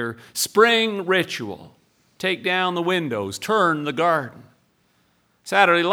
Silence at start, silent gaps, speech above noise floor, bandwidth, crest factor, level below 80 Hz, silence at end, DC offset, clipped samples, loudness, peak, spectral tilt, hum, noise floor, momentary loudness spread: 0 s; none; 43 dB; 20 kHz; 22 dB; -70 dBFS; 0 s; under 0.1%; under 0.1%; -20 LUFS; 0 dBFS; -3.5 dB/octave; none; -64 dBFS; 13 LU